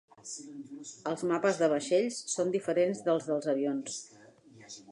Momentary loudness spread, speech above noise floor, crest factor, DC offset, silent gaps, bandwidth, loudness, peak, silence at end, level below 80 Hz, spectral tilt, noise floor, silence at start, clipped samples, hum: 17 LU; 25 dB; 18 dB; under 0.1%; none; 11.5 kHz; -31 LUFS; -14 dBFS; 0 s; -84 dBFS; -4.5 dB/octave; -56 dBFS; 0.25 s; under 0.1%; none